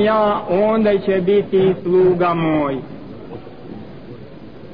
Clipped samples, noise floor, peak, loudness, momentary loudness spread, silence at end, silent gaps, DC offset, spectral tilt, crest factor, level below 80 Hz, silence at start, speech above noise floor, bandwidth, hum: under 0.1%; -37 dBFS; -6 dBFS; -16 LUFS; 21 LU; 0 s; none; 0.9%; -10 dB/octave; 12 dB; -48 dBFS; 0 s; 21 dB; 5.2 kHz; none